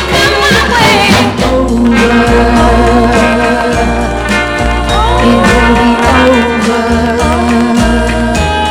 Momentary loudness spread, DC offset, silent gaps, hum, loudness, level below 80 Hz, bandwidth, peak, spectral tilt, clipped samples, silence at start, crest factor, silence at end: 5 LU; under 0.1%; none; none; -8 LUFS; -18 dBFS; 17.5 kHz; 0 dBFS; -5 dB/octave; 1%; 0 s; 8 dB; 0 s